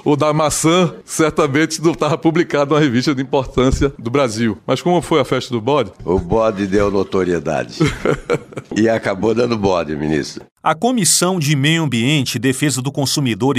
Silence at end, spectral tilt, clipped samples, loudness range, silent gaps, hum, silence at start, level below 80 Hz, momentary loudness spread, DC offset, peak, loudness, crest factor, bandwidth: 0 s; -4.5 dB/octave; under 0.1%; 2 LU; 10.52-10.56 s; none; 0.05 s; -36 dBFS; 5 LU; under 0.1%; -2 dBFS; -16 LUFS; 14 dB; 15.5 kHz